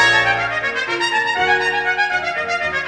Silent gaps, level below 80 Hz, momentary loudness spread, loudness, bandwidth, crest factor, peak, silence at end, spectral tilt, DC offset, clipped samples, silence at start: none; -50 dBFS; 5 LU; -17 LUFS; 10 kHz; 16 dB; -2 dBFS; 0 s; -2.5 dB/octave; under 0.1%; under 0.1%; 0 s